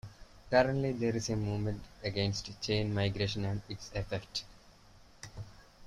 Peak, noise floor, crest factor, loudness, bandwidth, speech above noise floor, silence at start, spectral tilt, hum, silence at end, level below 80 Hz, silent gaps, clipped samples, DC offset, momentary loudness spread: -12 dBFS; -58 dBFS; 22 dB; -34 LUFS; 11.5 kHz; 25 dB; 0.05 s; -5.5 dB/octave; none; 0 s; -54 dBFS; none; under 0.1%; under 0.1%; 20 LU